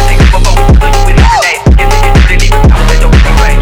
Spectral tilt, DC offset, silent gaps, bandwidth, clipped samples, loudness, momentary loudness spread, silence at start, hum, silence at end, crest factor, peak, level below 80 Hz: -5 dB/octave; under 0.1%; none; 15.5 kHz; 4%; -7 LUFS; 1 LU; 0 s; none; 0 s; 4 dB; 0 dBFS; -6 dBFS